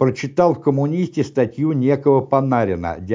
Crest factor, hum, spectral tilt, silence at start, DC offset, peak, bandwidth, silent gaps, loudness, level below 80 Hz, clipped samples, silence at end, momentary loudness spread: 14 dB; none; -8.5 dB/octave; 0 s; under 0.1%; -4 dBFS; 7.6 kHz; none; -18 LUFS; -46 dBFS; under 0.1%; 0 s; 5 LU